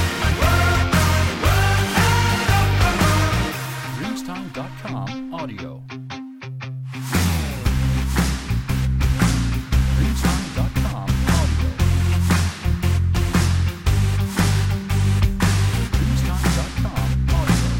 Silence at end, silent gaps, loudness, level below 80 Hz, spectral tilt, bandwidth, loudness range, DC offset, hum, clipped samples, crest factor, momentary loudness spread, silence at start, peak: 0 s; none; -20 LUFS; -26 dBFS; -5 dB/octave; 17 kHz; 8 LU; under 0.1%; none; under 0.1%; 12 dB; 12 LU; 0 s; -6 dBFS